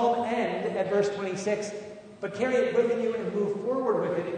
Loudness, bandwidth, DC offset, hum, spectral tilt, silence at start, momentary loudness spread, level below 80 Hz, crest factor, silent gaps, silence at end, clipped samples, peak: -28 LUFS; 9.6 kHz; under 0.1%; none; -5.5 dB/octave; 0 s; 12 LU; -70 dBFS; 14 dB; none; 0 s; under 0.1%; -12 dBFS